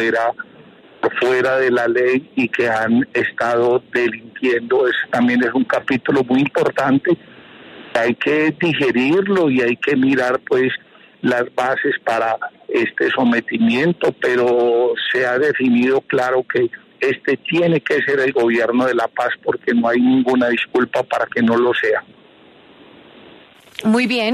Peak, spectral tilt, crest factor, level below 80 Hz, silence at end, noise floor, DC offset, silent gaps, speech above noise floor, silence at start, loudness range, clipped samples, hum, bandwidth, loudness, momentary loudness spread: -4 dBFS; -6 dB/octave; 12 dB; -62 dBFS; 0 s; -47 dBFS; under 0.1%; none; 30 dB; 0 s; 2 LU; under 0.1%; none; 12 kHz; -17 LUFS; 5 LU